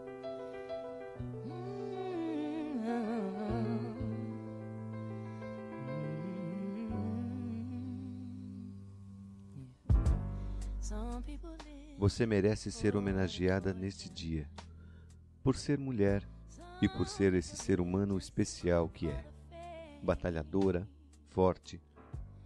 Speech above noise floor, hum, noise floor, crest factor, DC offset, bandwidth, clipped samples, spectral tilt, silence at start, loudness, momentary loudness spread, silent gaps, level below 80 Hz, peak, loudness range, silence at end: 23 dB; none; -56 dBFS; 20 dB; under 0.1%; 11 kHz; under 0.1%; -6.5 dB/octave; 0 s; -36 LUFS; 18 LU; none; -46 dBFS; -16 dBFS; 7 LU; 0 s